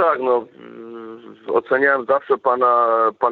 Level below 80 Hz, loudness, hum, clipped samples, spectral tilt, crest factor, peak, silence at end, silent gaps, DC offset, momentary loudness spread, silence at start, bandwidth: -72 dBFS; -18 LUFS; none; under 0.1%; -7.5 dB/octave; 14 dB; -4 dBFS; 0 s; none; under 0.1%; 21 LU; 0 s; 4.6 kHz